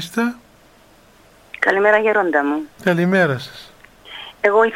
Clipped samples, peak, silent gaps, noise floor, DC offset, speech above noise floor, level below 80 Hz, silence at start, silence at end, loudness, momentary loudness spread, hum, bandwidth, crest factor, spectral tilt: under 0.1%; 0 dBFS; none; -50 dBFS; under 0.1%; 33 dB; -58 dBFS; 0 s; 0 s; -17 LUFS; 20 LU; none; 16 kHz; 18 dB; -6 dB/octave